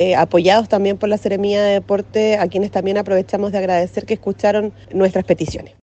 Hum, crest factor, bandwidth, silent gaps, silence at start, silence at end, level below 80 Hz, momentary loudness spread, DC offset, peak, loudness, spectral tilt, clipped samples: none; 16 dB; 8.4 kHz; none; 0 s; 0.2 s; -48 dBFS; 7 LU; under 0.1%; 0 dBFS; -17 LUFS; -6 dB/octave; under 0.1%